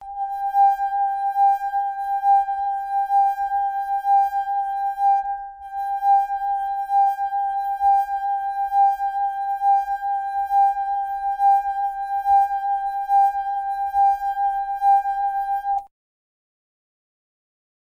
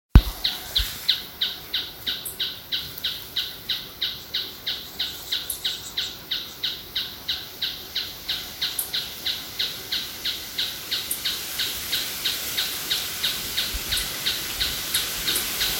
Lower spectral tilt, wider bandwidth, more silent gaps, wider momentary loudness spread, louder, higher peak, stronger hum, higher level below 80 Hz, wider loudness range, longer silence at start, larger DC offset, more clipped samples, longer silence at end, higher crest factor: about the same, -1 dB/octave vs -2 dB/octave; second, 15 kHz vs 17 kHz; neither; about the same, 6 LU vs 6 LU; first, -21 LUFS vs -26 LUFS; second, -10 dBFS vs 0 dBFS; neither; second, -56 dBFS vs -34 dBFS; about the same, 2 LU vs 3 LU; second, 0 s vs 0.15 s; neither; neither; first, 2.05 s vs 0 s; second, 12 dB vs 28 dB